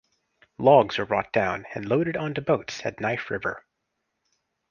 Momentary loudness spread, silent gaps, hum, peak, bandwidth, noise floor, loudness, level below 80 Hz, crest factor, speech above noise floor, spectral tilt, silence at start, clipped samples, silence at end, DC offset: 13 LU; none; none; -6 dBFS; 7.2 kHz; -79 dBFS; -24 LUFS; -60 dBFS; 20 dB; 55 dB; -6 dB/octave; 0.6 s; under 0.1%; 1.1 s; under 0.1%